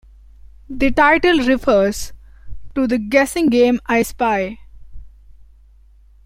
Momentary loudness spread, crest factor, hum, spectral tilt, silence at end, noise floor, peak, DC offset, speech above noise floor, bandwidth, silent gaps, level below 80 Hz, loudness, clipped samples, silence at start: 15 LU; 16 dB; none; -4.5 dB/octave; 0.85 s; -47 dBFS; -2 dBFS; under 0.1%; 32 dB; 16.5 kHz; none; -38 dBFS; -16 LUFS; under 0.1%; 0.7 s